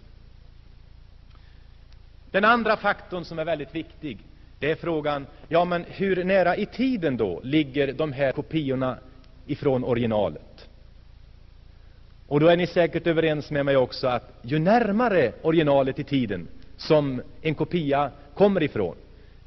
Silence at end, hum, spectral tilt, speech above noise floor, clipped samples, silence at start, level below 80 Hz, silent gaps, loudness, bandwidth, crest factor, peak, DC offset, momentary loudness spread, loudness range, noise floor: 0.45 s; none; -5 dB/octave; 25 dB; under 0.1%; 1.1 s; -48 dBFS; none; -24 LUFS; 6.2 kHz; 18 dB; -6 dBFS; under 0.1%; 10 LU; 5 LU; -48 dBFS